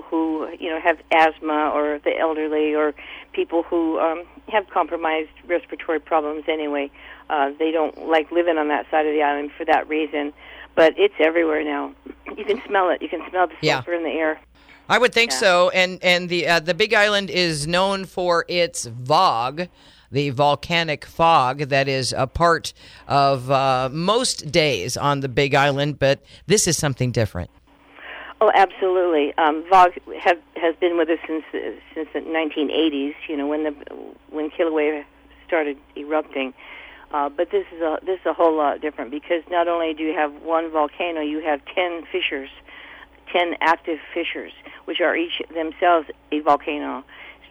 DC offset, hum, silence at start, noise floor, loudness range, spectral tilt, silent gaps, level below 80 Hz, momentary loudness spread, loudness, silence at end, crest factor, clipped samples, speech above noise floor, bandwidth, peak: under 0.1%; none; 0 s; -44 dBFS; 6 LU; -4 dB/octave; none; -52 dBFS; 13 LU; -21 LUFS; 0.2 s; 16 dB; under 0.1%; 24 dB; 15.5 kHz; -4 dBFS